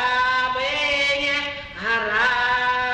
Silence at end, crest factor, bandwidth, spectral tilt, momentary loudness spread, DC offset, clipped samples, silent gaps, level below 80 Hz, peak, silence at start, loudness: 0 s; 12 dB; 9.8 kHz; -2 dB/octave; 5 LU; under 0.1%; under 0.1%; none; -48 dBFS; -10 dBFS; 0 s; -20 LUFS